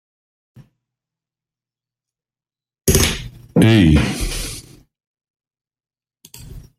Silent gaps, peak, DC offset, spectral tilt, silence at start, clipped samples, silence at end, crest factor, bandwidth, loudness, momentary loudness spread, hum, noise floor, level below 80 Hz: 5.07-5.14 s, 5.30-5.34 s; 0 dBFS; under 0.1%; -5 dB/octave; 2.85 s; under 0.1%; 0.2 s; 20 dB; 16 kHz; -16 LUFS; 22 LU; none; under -90 dBFS; -32 dBFS